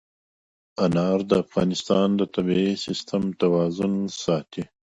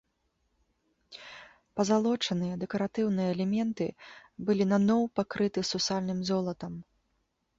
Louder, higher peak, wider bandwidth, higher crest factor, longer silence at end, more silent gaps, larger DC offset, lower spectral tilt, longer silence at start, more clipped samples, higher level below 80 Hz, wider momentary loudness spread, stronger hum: first, -23 LUFS vs -30 LUFS; first, -4 dBFS vs -14 dBFS; about the same, 8.4 kHz vs 7.8 kHz; about the same, 18 dB vs 18 dB; second, 0.3 s vs 0.75 s; neither; neither; about the same, -6.5 dB/octave vs -5.5 dB/octave; second, 0.8 s vs 1.1 s; neither; first, -56 dBFS vs -66 dBFS; second, 6 LU vs 20 LU; neither